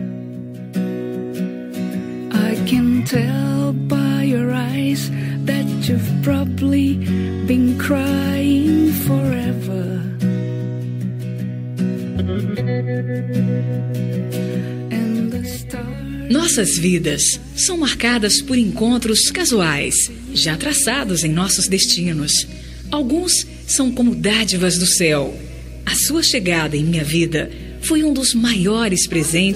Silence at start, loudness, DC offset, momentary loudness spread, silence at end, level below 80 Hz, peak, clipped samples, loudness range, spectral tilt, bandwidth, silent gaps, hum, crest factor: 0 s; -18 LUFS; under 0.1%; 10 LU; 0 s; -40 dBFS; -2 dBFS; under 0.1%; 6 LU; -4 dB/octave; 16 kHz; none; none; 16 dB